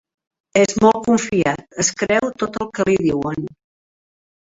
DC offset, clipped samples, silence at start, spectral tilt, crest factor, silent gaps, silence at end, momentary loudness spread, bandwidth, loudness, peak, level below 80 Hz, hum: under 0.1%; under 0.1%; 0.55 s; -4.5 dB/octave; 18 dB; none; 1 s; 10 LU; 8 kHz; -18 LUFS; -2 dBFS; -52 dBFS; none